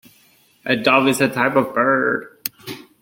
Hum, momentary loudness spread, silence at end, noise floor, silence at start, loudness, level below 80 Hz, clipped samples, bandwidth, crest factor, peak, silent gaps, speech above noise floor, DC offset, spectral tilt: none; 16 LU; 0.25 s; -55 dBFS; 0.65 s; -18 LUFS; -62 dBFS; under 0.1%; 17 kHz; 20 dB; 0 dBFS; none; 38 dB; under 0.1%; -4.5 dB/octave